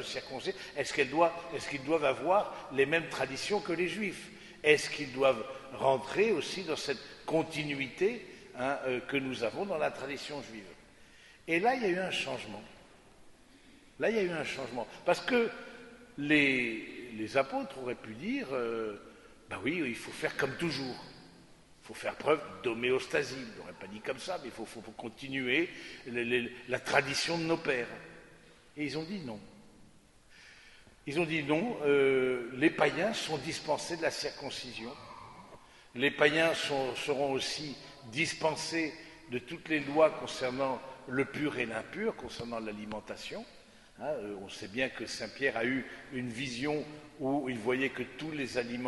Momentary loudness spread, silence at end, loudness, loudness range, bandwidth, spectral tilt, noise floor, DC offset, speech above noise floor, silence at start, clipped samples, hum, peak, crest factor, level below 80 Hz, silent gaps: 16 LU; 0 s; -33 LUFS; 6 LU; 11.5 kHz; -4 dB/octave; -60 dBFS; under 0.1%; 27 dB; 0 s; under 0.1%; none; -8 dBFS; 26 dB; -66 dBFS; none